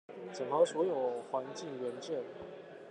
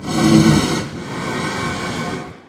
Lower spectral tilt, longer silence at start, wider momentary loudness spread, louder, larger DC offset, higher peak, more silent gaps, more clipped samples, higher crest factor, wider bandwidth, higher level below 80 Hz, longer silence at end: about the same, -5 dB/octave vs -5 dB/octave; about the same, 0.1 s vs 0 s; first, 17 LU vs 13 LU; second, -35 LUFS vs -17 LUFS; neither; second, -18 dBFS vs 0 dBFS; neither; neither; about the same, 20 dB vs 18 dB; second, 10 kHz vs 16 kHz; second, -82 dBFS vs -38 dBFS; about the same, 0 s vs 0.1 s